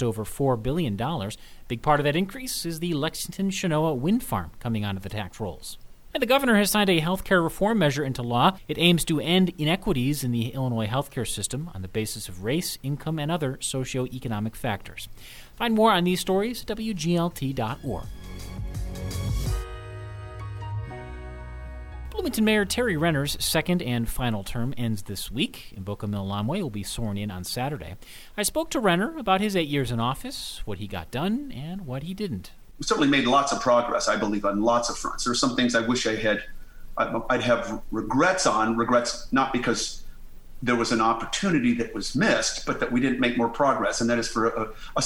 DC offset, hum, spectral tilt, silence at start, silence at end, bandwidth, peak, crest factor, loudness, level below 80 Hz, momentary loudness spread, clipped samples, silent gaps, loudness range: under 0.1%; none; -4.5 dB/octave; 0 s; 0 s; 17 kHz; -6 dBFS; 20 dB; -25 LUFS; -42 dBFS; 14 LU; under 0.1%; none; 7 LU